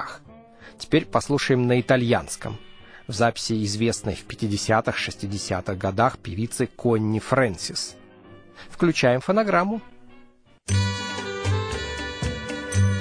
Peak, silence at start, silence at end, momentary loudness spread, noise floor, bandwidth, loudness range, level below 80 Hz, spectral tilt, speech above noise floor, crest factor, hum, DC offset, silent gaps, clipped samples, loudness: -4 dBFS; 0 s; 0 s; 12 LU; -52 dBFS; 10.5 kHz; 2 LU; -46 dBFS; -5 dB/octave; 29 dB; 20 dB; none; under 0.1%; none; under 0.1%; -24 LUFS